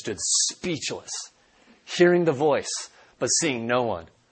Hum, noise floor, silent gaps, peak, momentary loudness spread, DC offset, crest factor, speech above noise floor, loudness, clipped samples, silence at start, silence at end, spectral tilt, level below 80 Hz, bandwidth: none; -58 dBFS; none; -6 dBFS; 14 LU; under 0.1%; 20 dB; 34 dB; -24 LUFS; under 0.1%; 0 s; 0.25 s; -3 dB/octave; -62 dBFS; 8.8 kHz